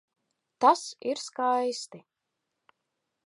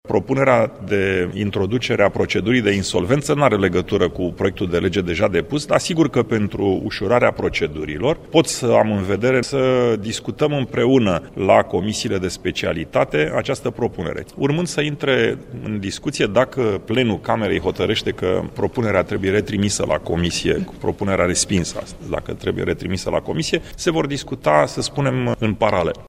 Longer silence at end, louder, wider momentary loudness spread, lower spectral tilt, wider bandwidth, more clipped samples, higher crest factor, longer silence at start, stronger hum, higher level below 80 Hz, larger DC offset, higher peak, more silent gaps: first, 1.25 s vs 0 s; second, -27 LUFS vs -19 LUFS; first, 12 LU vs 7 LU; second, -2.5 dB/octave vs -5 dB/octave; second, 11.5 kHz vs 15.5 kHz; neither; about the same, 22 dB vs 18 dB; first, 0.6 s vs 0.05 s; neither; second, -88 dBFS vs -42 dBFS; neither; second, -8 dBFS vs 0 dBFS; neither